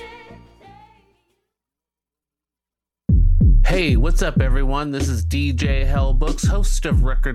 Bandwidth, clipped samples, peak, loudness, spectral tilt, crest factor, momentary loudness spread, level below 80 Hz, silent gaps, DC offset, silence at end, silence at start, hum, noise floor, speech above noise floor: 12.5 kHz; under 0.1%; -6 dBFS; -20 LUFS; -6 dB/octave; 12 dB; 6 LU; -20 dBFS; none; under 0.1%; 0 s; 0 s; none; -88 dBFS; 71 dB